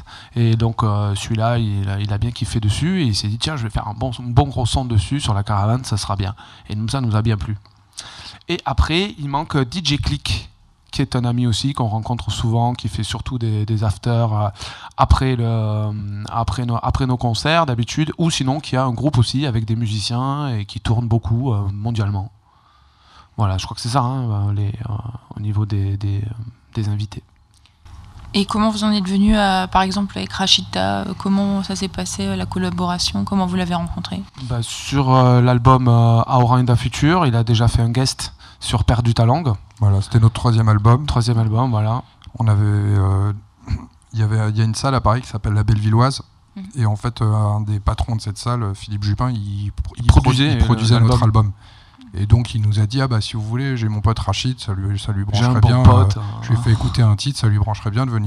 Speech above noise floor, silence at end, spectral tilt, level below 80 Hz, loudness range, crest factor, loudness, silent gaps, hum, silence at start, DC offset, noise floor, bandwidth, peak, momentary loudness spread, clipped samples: 36 dB; 0 s; -6 dB/octave; -32 dBFS; 6 LU; 18 dB; -18 LUFS; none; none; 0 s; under 0.1%; -53 dBFS; 11.5 kHz; 0 dBFS; 11 LU; under 0.1%